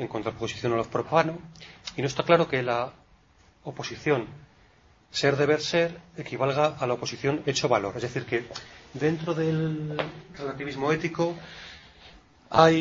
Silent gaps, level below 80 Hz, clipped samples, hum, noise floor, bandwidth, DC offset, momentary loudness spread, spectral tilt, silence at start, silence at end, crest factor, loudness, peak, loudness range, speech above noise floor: none; -58 dBFS; under 0.1%; none; -59 dBFS; 7.8 kHz; under 0.1%; 18 LU; -5.5 dB/octave; 0 s; 0 s; 24 dB; -27 LUFS; -2 dBFS; 3 LU; 33 dB